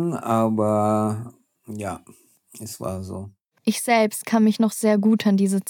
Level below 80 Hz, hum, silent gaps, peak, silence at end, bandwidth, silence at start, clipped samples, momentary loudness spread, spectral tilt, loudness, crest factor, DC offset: -72 dBFS; none; none; -4 dBFS; 0 s; 18 kHz; 0 s; under 0.1%; 18 LU; -5.5 dB/octave; -21 LUFS; 18 dB; under 0.1%